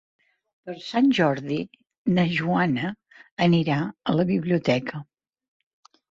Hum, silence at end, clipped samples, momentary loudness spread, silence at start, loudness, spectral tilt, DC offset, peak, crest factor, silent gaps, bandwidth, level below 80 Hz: none; 1.1 s; under 0.1%; 19 LU; 0.65 s; -23 LUFS; -7.5 dB/octave; under 0.1%; -6 dBFS; 18 dB; 1.98-2.05 s, 3.32-3.37 s; 7.6 kHz; -60 dBFS